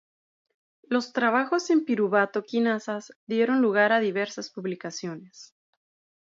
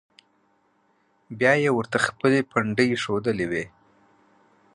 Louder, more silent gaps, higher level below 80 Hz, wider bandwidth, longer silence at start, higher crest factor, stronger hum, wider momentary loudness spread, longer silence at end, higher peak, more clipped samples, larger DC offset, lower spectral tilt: about the same, -25 LUFS vs -23 LUFS; first, 3.16-3.27 s vs none; second, -80 dBFS vs -60 dBFS; second, 7.8 kHz vs 11.5 kHz; second, 0.9 s vs 1.3 s; about the same, 18 dB vs 20 dB; neither; first, 13 LU vs 9 LU; second, 0.75 s vs 1.05 s; about the same, -8 dBFS vs -6 dBFS; neither; neither; about the same, -5 dB/octave vs -5.5 dB/octave